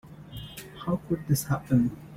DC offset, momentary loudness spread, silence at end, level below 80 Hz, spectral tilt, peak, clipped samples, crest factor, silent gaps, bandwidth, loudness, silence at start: under 0.1%; 16 LU; 0 s; -52 dBFS; -6.5 dB/octave; -12 dBFS; under 0.1%; 18 dB; none; 16.5 kHz; -28 LUFS; 0.05 s